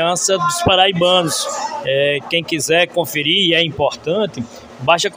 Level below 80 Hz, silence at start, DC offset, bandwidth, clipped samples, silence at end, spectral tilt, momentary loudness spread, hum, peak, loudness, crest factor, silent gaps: -50 dBFS; 0 s; under 0.1%; 16 kHz; under 0.1%; 0 s; -3 dB/octave; 9 LU; none; 0 dBFS; -15 LUFS; 16 dB; none